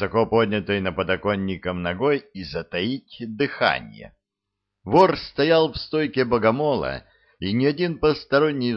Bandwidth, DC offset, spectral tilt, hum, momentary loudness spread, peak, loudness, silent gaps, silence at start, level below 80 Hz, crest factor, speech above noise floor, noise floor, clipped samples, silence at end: 6.6 kHz; under 0.1%; -7.5 dB/octave; none; 12 LU; -4 dBFS; -22 LUFS; none; 0 s; -50 dBFS; 18 dB; 61 dB; -83 dBFS; under 0.1%; 0 s